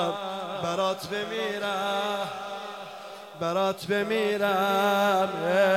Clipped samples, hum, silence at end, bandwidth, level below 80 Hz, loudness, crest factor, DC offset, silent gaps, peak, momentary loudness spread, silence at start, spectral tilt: under 0.1%; none; 0 s; 16 kHz; -72 dBFS; -27 LUFS; 14 dB; under 0.1%; none; -12 dBFS; 13 LU; 0 s; -4.5 dB/octave